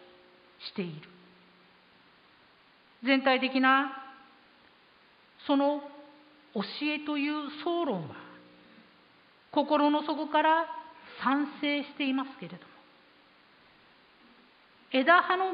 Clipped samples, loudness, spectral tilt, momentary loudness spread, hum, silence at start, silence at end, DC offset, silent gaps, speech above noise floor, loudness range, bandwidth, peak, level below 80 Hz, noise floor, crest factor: under 0.1%; -28 LUFS; -8 dB/octave; 21 LU; none; 0.6 s; 0 s; under 0.1%; none; 33 dB; 6 LU; 5.2 kHz; -10 dBFS; -82 dBFS; -61 dBFS; 22 dB